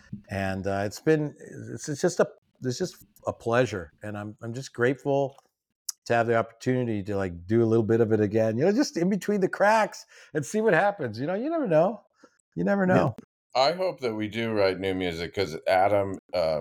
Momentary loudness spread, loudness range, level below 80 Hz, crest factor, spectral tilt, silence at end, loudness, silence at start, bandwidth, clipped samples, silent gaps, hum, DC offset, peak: 14 LU; 5 LU; -62 dBFS; 18 dB; -6 dB/octave; 0 s; -26 LUFS; 0.1 s; 17.5 kHz; under 0.1%; 2.38-2.42 s, 5.75-5.85 s, 5.98-6.02 s, 12.40-12.52 s, 13.24-13.50 s, 16.19-16.29 s; none; under 0.1%; -10 dBFS